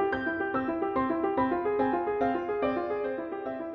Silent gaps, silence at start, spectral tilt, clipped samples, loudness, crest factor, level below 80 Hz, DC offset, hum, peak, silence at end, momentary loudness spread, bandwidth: none; 0 s; -4.5 dB/octave; under 0.1%; -29 LUFS; 14 dB; -58 dBFS; under 0.1%; none; -14 dBFS; 0 s; 5 LU; 5.8 kHz